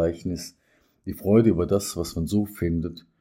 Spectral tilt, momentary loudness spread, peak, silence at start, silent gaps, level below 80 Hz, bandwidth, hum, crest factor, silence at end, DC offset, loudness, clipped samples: -6.5 dB/octave; 17 LU; -6 dBFS; 0 s; none; -48 dBFS; 16.5 kHz; none; 20 dB; 0.2 s; under 0.1%; -24 LUFS; under 0.1%